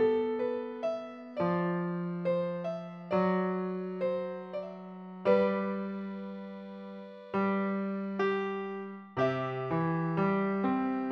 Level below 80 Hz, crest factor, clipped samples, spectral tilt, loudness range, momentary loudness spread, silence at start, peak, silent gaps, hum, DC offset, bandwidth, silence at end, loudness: -72 dBFS; 18 dB; under 0.1%; -9 dB/octave; 2 LU; 13 LU; 0 s; -14 dBFS; none; none; under 0.1%; 6.4 kHz; 0 s; -32 LUFS